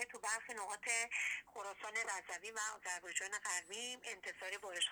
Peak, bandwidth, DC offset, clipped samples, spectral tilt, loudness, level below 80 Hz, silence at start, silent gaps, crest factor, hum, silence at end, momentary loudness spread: -22 dBFS; over 20 kHz; under 0.1%; under 0.1%; 2 dB/octave; -42 LUFS; -84 dBFS; 0 s; none; 22 dB; none; 0 s; 8 LU